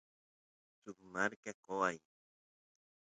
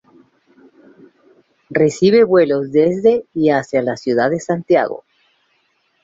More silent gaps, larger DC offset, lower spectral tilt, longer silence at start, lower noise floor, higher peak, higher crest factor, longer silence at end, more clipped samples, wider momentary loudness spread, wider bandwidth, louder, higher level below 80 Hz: first, 1.36-1.43 s, 1.54-1.63 s vs none; neither; second, -4 dB/octave vs -6.5 dB/octave; second, 0.85 s vs 1.7 s; first, under -90 dBFS vs -63 dBFS; second, -18 dBFS vs -2 dBFS; first, 26 dB vs 16 dB; about the same, 1.1 s vs 1.05 s; neither; first, 18 LU vs 8 LU; first, 9 kHz vs 7.8 kHz; second, -39 LUFS vs -15 LUFS; second, -82 dBFS vs -60 dBFS